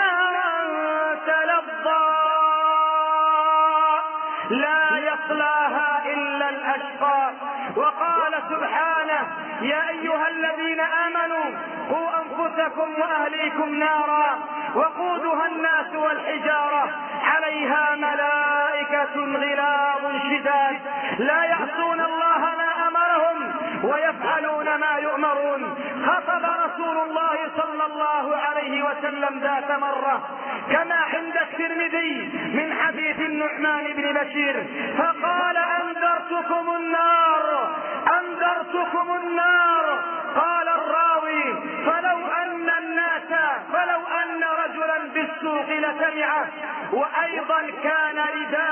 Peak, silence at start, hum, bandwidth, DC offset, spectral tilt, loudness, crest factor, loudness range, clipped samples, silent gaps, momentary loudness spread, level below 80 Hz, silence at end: -6 dBFS; 0 s; none; 3.3 kHz; under 0.1%; -8 dB/octave; -22 LUFS; 16 dB; 3 LU; under 0.1%; none; 6 LU; -78 dBFS; 0 s